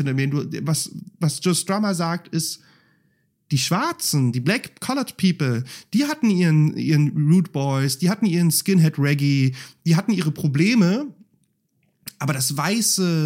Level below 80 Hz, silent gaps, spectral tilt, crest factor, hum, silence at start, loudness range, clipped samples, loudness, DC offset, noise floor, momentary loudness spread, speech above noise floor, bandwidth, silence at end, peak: -70 dBFS; none; -5 dB/octave; 14 dB; none; 0 s; 5 LU; under 0.1%; -21 LUFS; under 0.1%; -68 dBFS; 8 LU; 47 dB; 16.5 kHz; 0 s; -6 dBFS